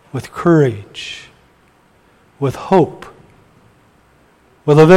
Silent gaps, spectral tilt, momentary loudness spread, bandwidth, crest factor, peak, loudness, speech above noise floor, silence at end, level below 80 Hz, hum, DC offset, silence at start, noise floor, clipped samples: none; -7.5 dB/octave; 19 LU; 12.5 kHz; 16 dB; 0 dBFS; -16 LUFS; 40 dB; 0 s; -52 dBFS; none; under 0.1%; 0.15 s; -52 dBFS; under 0.1%